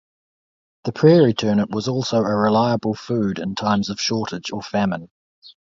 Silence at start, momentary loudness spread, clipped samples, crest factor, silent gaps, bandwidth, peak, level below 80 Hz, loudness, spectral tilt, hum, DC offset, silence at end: 0.85 s; 11 LU; under 0.1%; 18 dB; 5.11-5.42 s; 7.6 kHz; -2 dBFS; -56 dBFS; -20 LUFS; -6 dB/octave; none; under 0.1%; 0.15 s